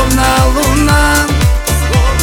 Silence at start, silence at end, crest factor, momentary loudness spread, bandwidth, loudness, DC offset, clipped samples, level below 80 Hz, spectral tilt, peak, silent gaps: 0 s; 0 s; 10 dB; 3 LU; 19.5 kHz; -11 LUFS; under 0.1%; under 0.1%; -14 dBFS; -4.5 dB/octave; 0 dBFS; none